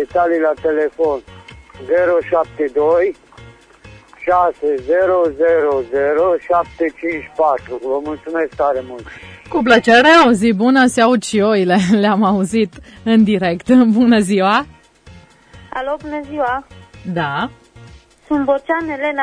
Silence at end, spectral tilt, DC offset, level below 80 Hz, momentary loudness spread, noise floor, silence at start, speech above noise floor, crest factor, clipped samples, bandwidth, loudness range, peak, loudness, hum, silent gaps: 0 s; -5.5 dB/octave; under 0.1%; -48 dBFS; 12 LU; -43 dBFS; 0 s; 28 dB; 16 dB; under 0.1%; 10.5 kHz; 9 LU; 0 dBFS; -15 LUFS; none; none